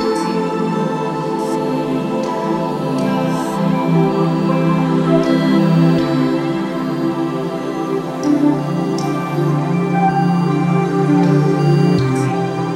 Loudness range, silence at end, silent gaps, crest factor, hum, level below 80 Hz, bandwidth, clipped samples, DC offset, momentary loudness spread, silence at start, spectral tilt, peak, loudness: 4 LU; 0 s; none; 14 dB; none; -50 dBFS; 13.5 kHz; under 0.1%; under 0.1%; 6 LU; 0 s; -7.5 dB/octave; -2 dBFS; -16 LUFS